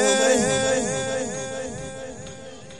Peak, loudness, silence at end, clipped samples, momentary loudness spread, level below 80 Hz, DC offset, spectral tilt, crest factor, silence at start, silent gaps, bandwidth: -6 dBFS; -23 LUFS; 0 s; under 0.1%; 19 LU; -50 dBFS; 0.4%; -3 dB/octave; 18 dB; 0 s; none; 13 kHz